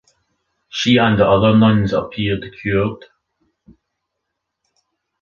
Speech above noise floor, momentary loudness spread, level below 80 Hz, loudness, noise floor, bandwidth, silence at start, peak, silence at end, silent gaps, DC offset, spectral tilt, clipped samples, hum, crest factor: 62 dB; 11 LU; -44 dBFS; -16 LUFS; -77 dBFS; 7.2 kHz; 0.75 s; -2 dBFS; 2.25 s; none; under 0.1%; -6.5 dB/octave; under 0.1%; none; 18 dB